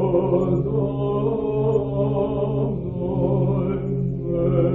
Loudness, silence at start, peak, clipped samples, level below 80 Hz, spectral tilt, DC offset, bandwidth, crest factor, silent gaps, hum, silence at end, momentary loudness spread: -22 LUFS; 0 s; -6 dBFS; under 0.1%; -40 dBFS; -11.5 dB/octave; under 0.1%; 3.8 kHz; 14 dB; none; none; 0 s; 5 LU